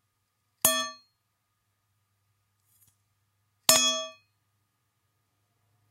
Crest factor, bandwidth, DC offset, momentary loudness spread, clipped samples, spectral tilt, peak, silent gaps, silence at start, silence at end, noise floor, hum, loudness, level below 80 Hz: 32 dB; 16 kHz; under 0.1%; 15 LU; under 0.1%; 0.5 dB/octave; -2 dBFS; none; 0.65 s; 1.8 s; -77 dBFS; none; -24 LUFS; -74 dBFS